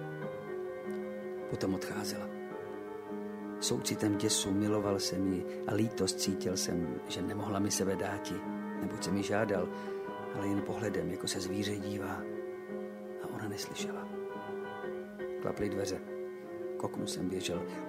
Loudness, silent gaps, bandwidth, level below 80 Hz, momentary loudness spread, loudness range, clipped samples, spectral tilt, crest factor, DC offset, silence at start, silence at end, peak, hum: -36 LUFS; none; 16 kHz; -66 dBFS; 10 LU; 7 LU; under 0.1%; -4.5 dB/octave; 18 dB; under 0.1%; 0 s; 0 s; -18 dBFS; none